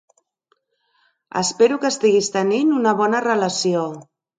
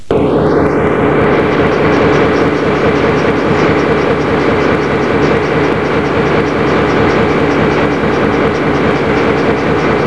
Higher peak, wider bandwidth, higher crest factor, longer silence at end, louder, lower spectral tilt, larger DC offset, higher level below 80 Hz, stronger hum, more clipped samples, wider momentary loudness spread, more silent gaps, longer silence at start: second, -4 dBFS vs 0 dBFS; second, 9.6 kHz vs 11 kHz; first, 16 dB vs 10 dB; first, 0.35 s vs 0 s; second, -19 LUFS vs -11 LUFS; second, -4 dB/octave vs -7 dB/octave; second, under 0.1% vs 2%; second, -70 dBFS vs -30 dBFS; neither; neither; first, 7 LU vs 2 LU; neither; first, 1.35 s vs 0 s